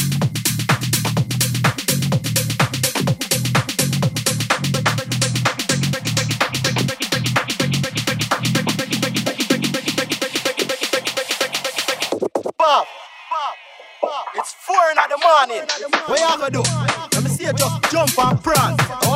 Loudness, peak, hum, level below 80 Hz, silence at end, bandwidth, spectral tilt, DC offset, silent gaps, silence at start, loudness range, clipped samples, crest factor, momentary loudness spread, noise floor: -19 LUFS; -2 dBFS; none; -50 dBFS; 0 s; 16.5 kHz; -3.5 dB/octave; under 0.1%; none; 0 s; 3 LU; under 0.1%; 18 dB; 5 LU; -39 dBFS